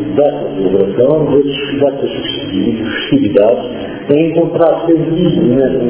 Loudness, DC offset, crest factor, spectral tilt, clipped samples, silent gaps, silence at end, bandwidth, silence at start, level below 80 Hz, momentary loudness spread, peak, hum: -13 LUFS; under 0.1%; 12 dB; -11 dB/octave; 0.2%; none; 0 s; 4 kHz; 0 s; -42 dBFS; 7 LU; 0 dBFS; none